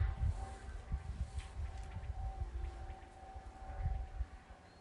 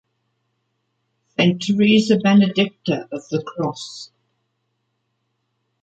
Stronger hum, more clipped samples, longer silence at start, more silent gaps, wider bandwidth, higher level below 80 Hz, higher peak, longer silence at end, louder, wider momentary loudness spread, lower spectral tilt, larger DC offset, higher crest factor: neither; neither; second, 0 s vs 1.4 s; neither; first, 11 kHz vs 8 kHz; first, -44 dBFS vs -62 dBFS; second, -24 dBFS vs -4 dBFS; second, 0 s vs 1.75 s; second, -46 LUFS vs -18 LUFS; second, 12 LU vs 15 LU; about the same, -6.5 dB/octave vs -6 dB/octave; neither; about the same, 18 dB vs 18 dB